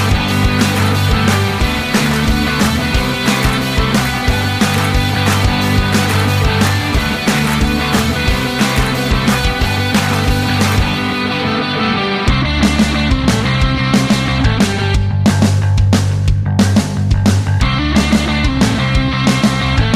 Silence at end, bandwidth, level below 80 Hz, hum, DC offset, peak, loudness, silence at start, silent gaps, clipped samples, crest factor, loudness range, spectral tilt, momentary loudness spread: 0 s; 15.5 kHz; -22 dBFS; none; under 0.1%; -2 dBFS; -14 LUFS; 0 s; none; under 0.1%; 12 dB; 1 LU; -5 dB/octave; 2 LU